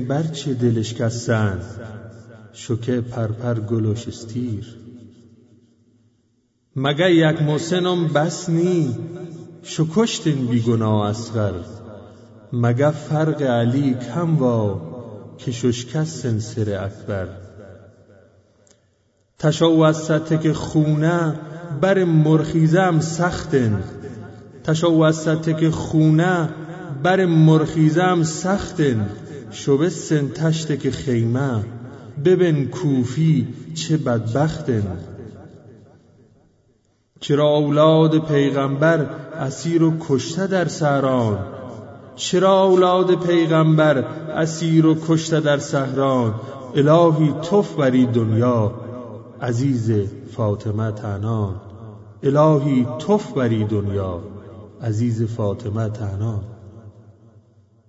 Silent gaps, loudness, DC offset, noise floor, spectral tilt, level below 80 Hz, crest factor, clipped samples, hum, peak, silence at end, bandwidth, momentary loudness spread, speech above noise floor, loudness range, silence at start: none; -19 LUFS; under 0.1%; -64 dBFS; -6.5 dB/octave; -52 dBFS; 16 dB; under 0.1%; none; -2 dBFS; 0.9 s; 8 kHz; 17 LU; 46 dB; 8 LU; 0 s